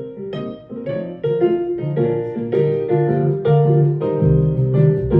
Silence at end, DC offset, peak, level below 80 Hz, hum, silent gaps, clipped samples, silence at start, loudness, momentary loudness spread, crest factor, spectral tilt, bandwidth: 0 s; under 0.1%; -4 dBFS; -38 dBFS; none; none; under 0.1%; 0 s; -18 LUFS; 12 LU; 14 dB; -12 dB/octave; 4 kHz